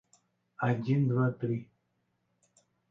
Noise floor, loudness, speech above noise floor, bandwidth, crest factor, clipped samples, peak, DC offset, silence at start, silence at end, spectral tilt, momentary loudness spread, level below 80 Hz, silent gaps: -78 dBFS; -31 LUFS; 49 dB; 7.8 kHz; 16 dB; under 0.1%; -18 dBFS; under 0.1%; 0.6 s; 1.25 s; -9.5 dB/octave; 7 LU; -74 dBFS; none